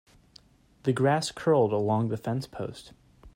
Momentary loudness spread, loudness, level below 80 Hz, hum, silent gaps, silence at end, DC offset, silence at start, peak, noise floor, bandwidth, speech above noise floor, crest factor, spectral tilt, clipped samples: 14 LU; -27 LUFS; -60 dBFS; none; none; 0.05 s; under 0.1%; 0.85 s; -12 dBFS; -58 dBFS; 16 kHz; 31 dB; 18 dB; -6.5 dB/octave; under 0.1%